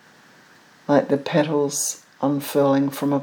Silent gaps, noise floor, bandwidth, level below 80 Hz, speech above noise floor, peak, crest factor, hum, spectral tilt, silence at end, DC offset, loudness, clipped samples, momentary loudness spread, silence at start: none; -51 dBFS; over 20 kHz; -80 dBFS; 31 dB; -4 dBFS; 18 dB; none; -5 dB/octave; 0 s; under 0.1%; -21 LUFS; under 0.1%; 6 LU; 0.9 s